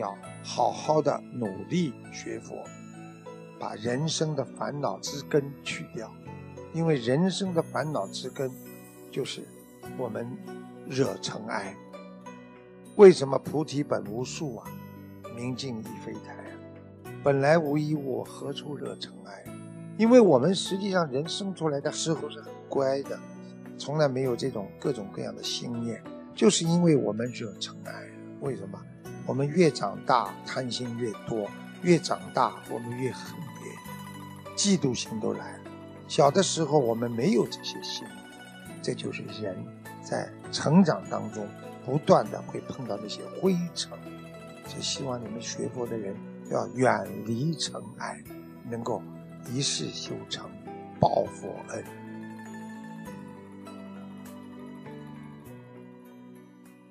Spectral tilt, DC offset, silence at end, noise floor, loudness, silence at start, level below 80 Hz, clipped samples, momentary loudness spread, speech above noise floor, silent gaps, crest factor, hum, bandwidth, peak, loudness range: -5 dB/octave; under 0.1%; 0.15 s; -52 dBFS; -28 LUFS; 0 s; -68 dBFS; under 0.1%; 20 LU; 24 dB; none; 24 dB; none; 15 kHz; -4 dBFS; 10 LU